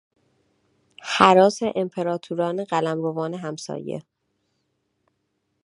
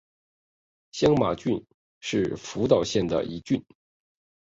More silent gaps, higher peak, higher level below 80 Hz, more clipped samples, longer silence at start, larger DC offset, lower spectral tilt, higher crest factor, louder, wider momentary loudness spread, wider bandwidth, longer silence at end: second, none vs 1.74-2.01 s; first, 0 dBFS vs -6 dBFS; second, -66 dBFS vs -54 dBFS; neither; about the same, 1 s vs 0.95 s; neither; about the same, -5 dB/octave vs -6 dB/octave; about the same, 24 dB vs 22 dB; first, -22 LUFS vs -26 LUFS; first, 17 LU vs 8 LU; first, 11 kHz vs 8 kHz; first, 1.65 s vs 0.8 s